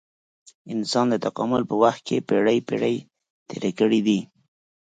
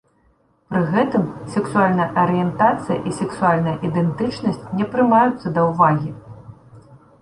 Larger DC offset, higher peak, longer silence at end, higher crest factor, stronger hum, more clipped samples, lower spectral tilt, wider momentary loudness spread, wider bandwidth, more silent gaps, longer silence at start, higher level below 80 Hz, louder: neither; about the same, -4 dBFS vs -2 dBFS; first, 0.65 s vs 0.25 s; about the same, 20 dB vs 18 dB; neither; neither; second, -5.5 dB/octave vs -7.5 dB/octave; about the same, 9 LU vs 8 LU; second, 9.2 kHz vs 11 kHz; first, 3.30-3.46 s vs none; about the same, 0.65 s vs 0.7 s; second, -66 dBFS vs -52 dBFS; second, -23 LUFS vs -19 LUFS